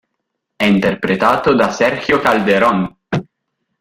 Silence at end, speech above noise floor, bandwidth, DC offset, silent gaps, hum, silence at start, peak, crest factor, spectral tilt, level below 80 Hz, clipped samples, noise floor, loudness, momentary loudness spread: 0.6 s; 61 dB; 16 kHz; under 0.1%; none; none; 0.6 s; 0 dBFS; 14 dB; -6 dB/octave; -48 dBFS; under 0.1%; -74 dBFS; -15 LUFS; 9 LU